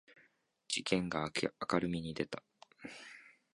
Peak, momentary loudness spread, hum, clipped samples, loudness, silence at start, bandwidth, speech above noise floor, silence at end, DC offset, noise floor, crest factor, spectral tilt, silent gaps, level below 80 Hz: -16 dBFS; 17 LU; none; under 0.1%; -37 LUFS; 0.1 s; 11.5 kHz; 35 dB; 0.25 s; under 0.1%; -72 dBFS; 24 dB; -4.5 dB/octave; none; -66 dBFS